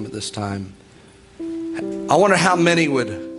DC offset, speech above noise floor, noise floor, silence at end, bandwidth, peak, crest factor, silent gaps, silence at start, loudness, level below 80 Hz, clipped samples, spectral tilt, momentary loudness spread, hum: under 0.1%; 28 dB; -47 dBFS; 0 s; 11.5 kHz; -2 dBFS; 18 dB; none; 0 s; -19 LUFS; -56 dBFS; under 0.1%; -4.5 dB/octave; 16 LU; none